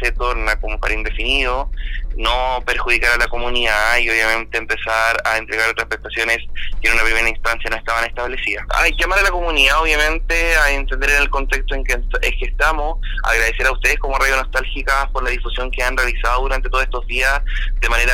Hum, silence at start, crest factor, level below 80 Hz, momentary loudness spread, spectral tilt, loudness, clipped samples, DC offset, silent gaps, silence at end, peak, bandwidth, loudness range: none; 0 s; 16 dB; -22 dBFS; 7 LU; -2.5 dB/octave; -17 LUFS; under 0.1%; under 0.1%; none; 0 s; 0 dBFS; 16 kHz; 3 LU